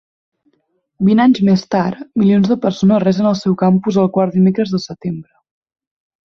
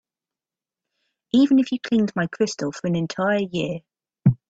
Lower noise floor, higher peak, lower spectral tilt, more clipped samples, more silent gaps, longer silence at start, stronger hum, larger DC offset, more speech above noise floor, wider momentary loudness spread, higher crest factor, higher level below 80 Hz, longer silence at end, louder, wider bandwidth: second, -65 dBFS vs under -90 dBFS; about the same, -2 dBFS vs -4 dBFS; first, -8 dB/octave vs -6.5 dB/octave; neither; neither; second, 1 s vs 1.35 s; neither; neither; second, 51 dB vs over 69 dB; about the same, 9 LU vs 9 LU; second, 12 dB vs 18 dB; about the same, -54 dBFS vs -58 dBFS; first, 1.05 s vs 0.15 s; first, -14 LUFS vs -22 LUFS; second, 6.8 kHz vs 8 kHz